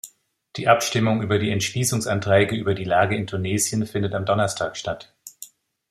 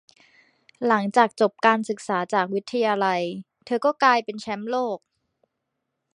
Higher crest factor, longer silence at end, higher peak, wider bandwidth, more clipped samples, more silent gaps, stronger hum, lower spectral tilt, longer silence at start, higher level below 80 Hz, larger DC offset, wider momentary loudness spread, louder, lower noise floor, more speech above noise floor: about the same, 22 dB vs 22 dB; second, 0.45 s vs 1.15 s; about the same, 0 dBFS vs -2 dBFS; first, 15.5 kHz vs 11 kHz; neither; neither; neither; about the same, -4.5 dB/octave vs -5 dB/octave; second, 0.05 s vs 0.8 s; first, -56 dBFS vs -76 dBFS; neither; first, 20 LU vs 11 LU; about the same, -22 LUFS vs -23 LUFS; second, -52 dBFS vs -80 dBFS; second, 31 dB vs 57 dB